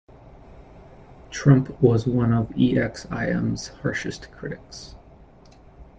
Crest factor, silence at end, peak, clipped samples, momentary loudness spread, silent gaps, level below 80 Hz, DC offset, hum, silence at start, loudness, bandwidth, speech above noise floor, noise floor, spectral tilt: 20 dB; 0.15 s; -4 dBFS; under 0.1%; 18 LU; none; -46 dBFS; under 0.1%; none; 0.25 s; -22 LUFS; 8.2 kHz; 27 dB; -49 dBFS; -7 dB/octave